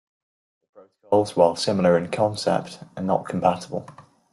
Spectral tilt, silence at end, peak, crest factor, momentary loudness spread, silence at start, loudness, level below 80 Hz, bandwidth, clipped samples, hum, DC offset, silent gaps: -6 dB/octave; 0.3 s; -2 dBFS; 20 dB; 12 LU; 0.75 s; -22 LUFS; -62 dBFS; 12 kHz; under 0.1%; none; under 0.1%; none